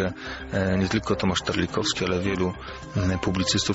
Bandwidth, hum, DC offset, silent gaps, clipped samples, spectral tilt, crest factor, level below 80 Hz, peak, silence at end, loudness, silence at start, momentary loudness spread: 8 kHz; none; under 0.1%; none; under 0.1%; -4.5 dB/octave; 16 dB; -44 dBFS; -10 dBFS; 0 s; -25 LUFS; 0 s; 6 LU